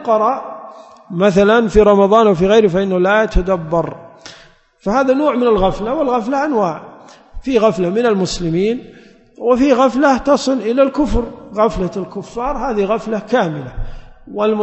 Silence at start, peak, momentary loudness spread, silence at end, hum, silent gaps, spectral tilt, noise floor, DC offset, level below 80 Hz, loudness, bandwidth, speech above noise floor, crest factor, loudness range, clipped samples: 0 s; 0 dBFS; 15 LU; 0 s; none; none; -6 dB/octave; -45 dBFS; under 0.1%; -32 dBFS; -15 LUFS; 8.4 kHz; 31 dB; 14 dB; 5 LU; under 0.1%